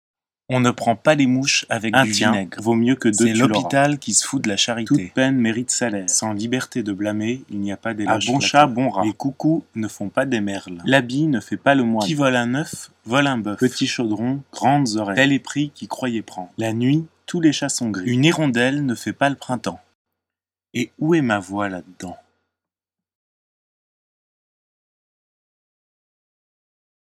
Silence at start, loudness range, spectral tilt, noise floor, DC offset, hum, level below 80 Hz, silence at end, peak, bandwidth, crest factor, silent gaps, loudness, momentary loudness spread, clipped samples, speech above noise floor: 0.5 s; 7 LU; -4 dB/octave; -89 dBFS; under 0.1%; none; -66 dBFS; 5 s; 0 dBFS; 15 kHz; 20 dB; 19.95-20.05 s; -20 LUFS; 10 LU; under 0.1%; 69 dB